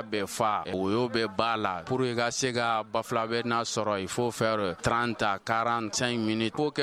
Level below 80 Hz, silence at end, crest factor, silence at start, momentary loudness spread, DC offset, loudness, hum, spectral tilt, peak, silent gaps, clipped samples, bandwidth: -58 dBFS; 0 s; 20 dB; 0 s; 2 LU; under 0.1%; -28 LUFS; none; -4 dB/octave; -8 dBFS; none; under 0.1%; 15 kHz